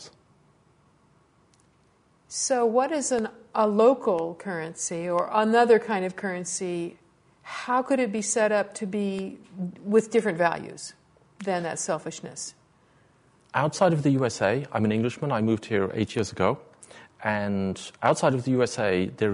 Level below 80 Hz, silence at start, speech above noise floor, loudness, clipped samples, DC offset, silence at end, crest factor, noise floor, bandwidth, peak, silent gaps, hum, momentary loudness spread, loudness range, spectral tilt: -66 dBFS; 0 s; 38 dB; -26 LUFS; under 0.1%; under 0.1%; 0 s; 20 dB; -63 dBFS; 11 kHz; -6 dBFS; none; none; 14 LU; 5 LU; -5 dB/octave